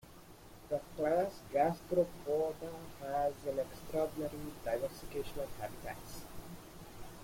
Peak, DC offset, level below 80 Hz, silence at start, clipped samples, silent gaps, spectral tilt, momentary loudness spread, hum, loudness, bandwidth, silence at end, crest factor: -20 dBFS; under 0.1%; -58 dBFS; 0.05 s; under 0.1%; none; -5.5 dB/octave; 18 LU; none; -38 LUFS; 16.5 kHz; 0 s; 18 dB